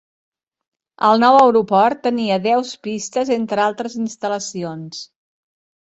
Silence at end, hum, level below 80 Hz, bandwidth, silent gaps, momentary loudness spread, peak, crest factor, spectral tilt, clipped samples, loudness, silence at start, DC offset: 0.8 s; none; -64 dBFS; 8.2 kHz; none; 16 LU; -2 dBFS; 18 dB; -4.5 dB/octave; under 0.1%; -17 LUFS; 1 s; under 0.1%